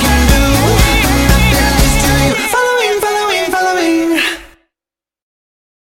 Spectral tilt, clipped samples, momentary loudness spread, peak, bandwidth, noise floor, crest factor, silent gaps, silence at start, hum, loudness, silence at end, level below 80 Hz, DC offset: -4 dB/octave; under 0.1%; 4 LU; 0 dBFS; 17 kHz; -89 dBFS; 12 dB; none; 0 s; none; -11 LUFS; 1.4 s; -18 dBFS; under 0.1%